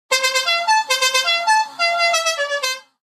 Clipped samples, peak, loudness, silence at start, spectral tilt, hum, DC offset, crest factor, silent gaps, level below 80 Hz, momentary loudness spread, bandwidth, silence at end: under 0.1%; -6 dBFS; -17 LUFS; 0.1 s; 3.5 dB/octave; none; under 0.1%; 12 dB; none; -74 dBFS; 5 LU; 15.5 kHz; 0.2 s